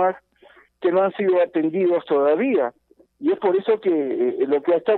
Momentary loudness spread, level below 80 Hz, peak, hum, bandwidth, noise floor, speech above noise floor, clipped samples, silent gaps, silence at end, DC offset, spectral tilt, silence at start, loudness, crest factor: 5 LU; -72 dBFS; -8 dBFS; none; 4.2 kHz; -53 dBFS; 33 dB; under 0.1%; none; 0 s; under 0.1%; -9.5 dB/octave; 0 s; -21 LUFS; 14 dB